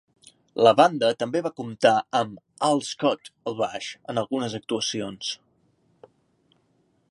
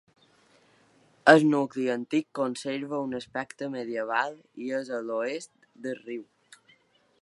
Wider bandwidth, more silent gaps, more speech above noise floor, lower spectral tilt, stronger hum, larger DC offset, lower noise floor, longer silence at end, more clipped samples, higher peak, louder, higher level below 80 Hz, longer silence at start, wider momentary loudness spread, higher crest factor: about the same, 11.5 kHz vs 11.5 kHz; neither; first, 43 dB vs 37 dB; second, -4 dB/octave vs -5.5 dB/octave; neither; neither; about the same, -67 dBFS vs -64 dBFS; first, 1.75 s vs 1 s; neither; about the same, -2 dBFS vs -2 dBFS; first, -24 LUFS vs -28 LUFS; first, -70 dBFS vs -78 dBFS; second, 0.55 s vs 1.25 s; second, 13 LU vs 19 LU; about the same, 24 dB vs 28 dB